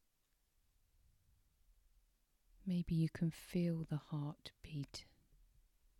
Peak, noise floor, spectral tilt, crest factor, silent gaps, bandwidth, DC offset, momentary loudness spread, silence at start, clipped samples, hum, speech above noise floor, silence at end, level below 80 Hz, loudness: -28 dBFS; -81 dBFS; -7.5 dB/octave; 18 dB; none; 13 kHz; under 0.1%; 13 LU; 2.65 s; under 0.1%; none; 39 dB; 0.95 s; -66 dBFS; -42 LUFS